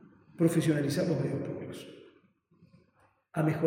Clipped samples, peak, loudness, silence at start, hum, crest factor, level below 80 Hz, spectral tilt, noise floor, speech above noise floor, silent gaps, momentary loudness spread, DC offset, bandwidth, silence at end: under 0.1%; -12 dBFS; -30 LUFS; 0.4 s; none; 20 dB; -74 dBFS; -7 dB/octave; -68 dBFS; 39 dB; none; 16 LU; under 0.1%; 16 kHz; 0 s